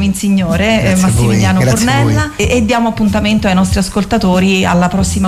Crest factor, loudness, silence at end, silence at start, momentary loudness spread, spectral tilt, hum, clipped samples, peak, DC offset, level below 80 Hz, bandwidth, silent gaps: 8 dB; -11 LUFS; 0 s; 0 s; 3 LU; -5.5 dB/octave; none; under 0.1%; -2 dBFS; under 0.1%; -26 dBFS; 15.5 kHz; none